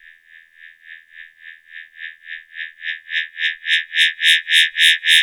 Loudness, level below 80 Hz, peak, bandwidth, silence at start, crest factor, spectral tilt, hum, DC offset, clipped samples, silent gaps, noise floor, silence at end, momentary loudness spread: -15 LUFS; -78 dBFS; -4 dBFS; over 20 kHz; 0.65 s; 16 dB; 8.5 dB/octave; none; under 0.1%; under 0.1%; none; -48 dBFS; 0 s; 23 LU